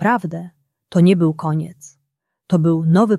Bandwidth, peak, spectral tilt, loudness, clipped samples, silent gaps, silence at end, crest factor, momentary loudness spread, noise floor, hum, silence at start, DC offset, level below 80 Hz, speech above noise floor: 11 kHz; -2 dBFS; -8 dB/octave; -17 LUFS; under 0.1%; none; 0 s; 16 dB; 17 LU; -75 dBFS; none; 0 s; under 0.1%; -62 dBFS; 59 dB